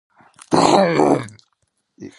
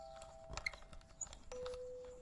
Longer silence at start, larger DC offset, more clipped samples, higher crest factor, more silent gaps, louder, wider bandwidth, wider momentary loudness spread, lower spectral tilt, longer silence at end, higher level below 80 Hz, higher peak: first, 0.5 s vs 0 s; neither; neither; second, 18 dB vs 24 dB; neither; first, -16 LUFS vs -49 LUFS; about the same, 11.5 kHz vs 11.5 kHz; second, 8 LU vs 11 LU; first, -5 dB/octave vs -2 dB/octave; about the same, 0.1 s vs 0 s; about the same, -56 dBFS vs -60 dBFS; first, 0 dBFS vs -26 dBFS